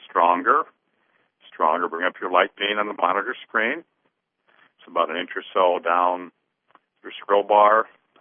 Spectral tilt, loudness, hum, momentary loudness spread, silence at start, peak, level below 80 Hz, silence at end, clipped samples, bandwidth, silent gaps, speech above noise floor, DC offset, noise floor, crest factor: -7.5 dB/octave; -21 LUFS; none; 12 LU; 0 s; -2 dBFS; -86 dBFS; 0.35 s; under 0.1%; 3.7 kHz; none; 51 dB; under 0.1%; -72 dBFS; 22 dB